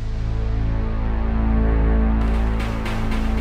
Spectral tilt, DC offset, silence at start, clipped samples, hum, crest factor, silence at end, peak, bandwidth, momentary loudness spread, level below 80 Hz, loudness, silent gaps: -8 dB/octave; under 0.1%; 0 s; under 0.1%; none; 10 dB; 0 s; -8 dBFS; 6.4 kHz; 5 LU; -20 dBFS; -22 LUFS; none